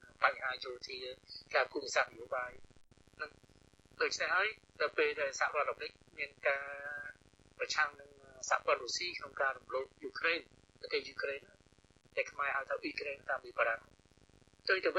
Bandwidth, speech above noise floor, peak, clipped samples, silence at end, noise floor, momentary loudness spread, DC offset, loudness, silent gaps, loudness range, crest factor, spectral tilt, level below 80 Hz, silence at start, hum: 11.5 kHz; 30 dB; -14 dBFS; under 0.1%; 0 s; -67 dBFS; 13 LU; under 0.1%; -37 LUFS; none; 3 LU; 24 dB; -1.5 dB/octave; -72 dBFS; 0 s; none